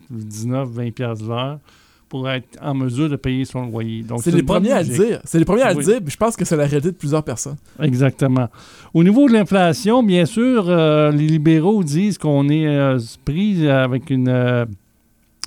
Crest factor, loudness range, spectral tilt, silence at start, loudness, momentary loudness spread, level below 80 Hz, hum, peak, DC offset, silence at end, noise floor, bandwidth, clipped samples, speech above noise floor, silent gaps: 14 dB; 8 LU; -6.5 dB/octave; 0.1 s; -17 LUFS; 11 LU; -46 dBFS; none; -2 dBFS; under 0.1%; 0.7 s; -58 dBFS; 16 kHz; under 0.1%; 41 dB; none